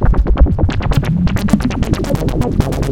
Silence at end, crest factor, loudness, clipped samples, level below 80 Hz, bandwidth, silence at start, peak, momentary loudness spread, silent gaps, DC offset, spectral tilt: 0 s; 12 dB; -16 LUFS; under 0.1%; -16 dBFS; 16.5 kHz; 0 s; 0 dBFS; 3 LU; none; under 0.1%; -7.5 dB/octave